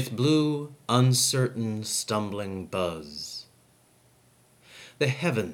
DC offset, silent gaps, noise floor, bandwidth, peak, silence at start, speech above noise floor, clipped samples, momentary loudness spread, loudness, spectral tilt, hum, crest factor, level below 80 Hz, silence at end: under 0.1%; none; -61 dBFS; 17 kHz; -6 dBFS; 0 s; 35 dB; under 0.1%; 14 LU; -27 LUFS; -4.5 dB/octave; none; 22 dB; -66 dBFS; 0 s